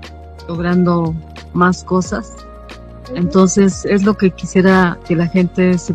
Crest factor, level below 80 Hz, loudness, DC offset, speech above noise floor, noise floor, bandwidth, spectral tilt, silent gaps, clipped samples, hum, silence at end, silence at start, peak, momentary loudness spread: 14 dB; -38 dBFS; -14 LUFS; under 0.1%; 20 dB; -34 dBFS; 8.8 kHz; -6.5 dB/octave; none; 0.1%; none; 0 s; 0 s; 0 dBFS; 23 LU